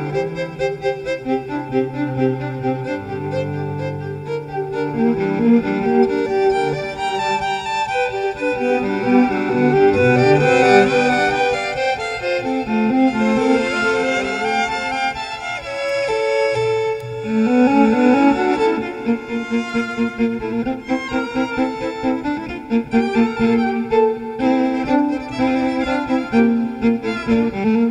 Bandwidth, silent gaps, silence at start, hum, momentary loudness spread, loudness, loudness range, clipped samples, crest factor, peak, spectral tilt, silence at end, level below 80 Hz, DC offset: 10 kHz; none; 0 s; none; 9 LU; -18 LUFS; 7 LU; under 0.1%; 18 dB; 0 dBFS; -6 dB/octave; 0 s; -46 dBFS; under 0.1%